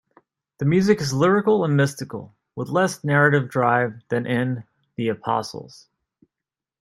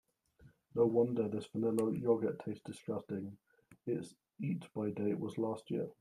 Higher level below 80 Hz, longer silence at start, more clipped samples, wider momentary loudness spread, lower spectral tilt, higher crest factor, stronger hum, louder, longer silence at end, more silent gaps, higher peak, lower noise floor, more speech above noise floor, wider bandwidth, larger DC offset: first, -62 dBFS vs -76 dBFS; first, 0.6 s vs 0.4 s; neither; first, 16 LU vs 12 LU; second, -6.5 dB/octave vs -8 dB/octave; about the same, 18 dB vs 18 dB; neither; first, -21 LUFS vs -37 LUFS; first, 1.15 s vs 0.1 s; neither; first, -4 dBFS vs -18 dBFS; first, -88 dBFS vs -65 dBFS; first, 67 dB vs 29 dB; about the same, 13 kHz vs 14 kHz; neither